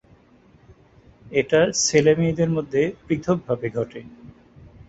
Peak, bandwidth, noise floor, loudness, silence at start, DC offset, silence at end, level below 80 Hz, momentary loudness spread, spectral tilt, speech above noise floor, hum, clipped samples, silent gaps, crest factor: -2 dBFS; 8 kHz; -54 dBFS; -21 LUFS; 1.25 s; under 0.1%; 0.6 s; -52 dBFS; 10 LU; -4.5 dB/octave; 33 dB; none; under 0.1%; none; 20 dB